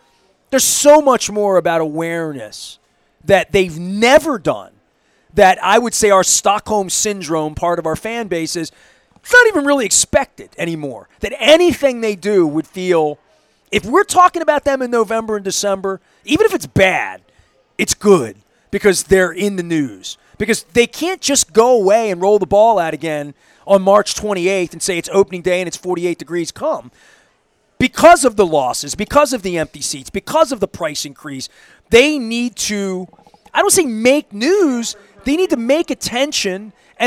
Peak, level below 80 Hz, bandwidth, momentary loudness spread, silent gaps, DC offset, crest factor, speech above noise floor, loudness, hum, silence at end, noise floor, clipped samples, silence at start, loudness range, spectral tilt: 0 dBFS; -44 dBFS; 16.5 kHz; 14 LU; none; under 0.1%; 16 dB; 45 dB; -15 LUFS; none; 0 s; -60 dBFS; under 0.1%; 0.5 s; 3 LU; -3 dB/octave